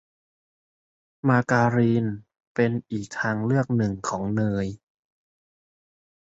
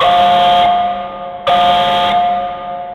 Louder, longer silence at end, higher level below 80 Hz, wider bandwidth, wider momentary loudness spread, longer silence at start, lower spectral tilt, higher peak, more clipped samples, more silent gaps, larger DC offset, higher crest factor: second, -24 LUFS vs -12 LUFS; first, 1.45 s vs 0 s; second, -56 dBFS vs -44 dBFS; second, 8 kHz vs 9.4 kHz; about the same, 11 LU vs 12 LU; first, 1.25 s vs 0 s; first, -7.5 dB/octave vs -4 dB/octave; second, -6 dBFS vs 0 dBFS; neither; first, 2.47-2.55 s vs none; neither; first, 20 dB vs 12 dB